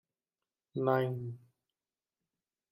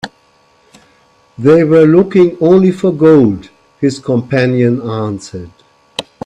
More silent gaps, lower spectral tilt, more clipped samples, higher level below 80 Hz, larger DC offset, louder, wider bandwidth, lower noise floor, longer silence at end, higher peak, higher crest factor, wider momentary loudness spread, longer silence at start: neither; first, -9 dB/octave vs -7.5 dB/octave; neither; second, -78 dBFS vs -50 dBFS; neither; second, -34 LUFS vs -10 LUFS; first, 16 kHz vs 10.5 kHz; first, under -90 dBFS vs -51 dBFS; first, 1.35 s vs 0.25 s; second, -16 dBFS vs 0 dBFS; first, 22 dB vs 12 dB; about the same, 15 LU vs 17 LU; first, 0.75 s vs 0.05 s